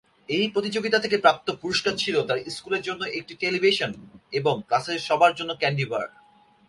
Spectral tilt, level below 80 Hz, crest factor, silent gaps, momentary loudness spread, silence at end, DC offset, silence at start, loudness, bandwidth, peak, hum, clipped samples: -4 dB/octave; -64 dBFS; 22 dB; none; 10 LU; 0.6 s; under 0.1%; 0.3 s; -24 LUFS; 11.5 kHz; -4 dBFS; none; under 0.1%